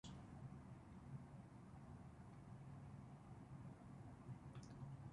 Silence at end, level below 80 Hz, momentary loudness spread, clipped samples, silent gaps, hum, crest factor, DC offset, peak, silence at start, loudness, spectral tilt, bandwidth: 0 s; -70 dBFS; 4 LU; under 0.1%; none; none; 14 dB; under 0.1%; -44 dBFS; 0.05 s; -59 LUFS; -7 dB/octave; 11 kHz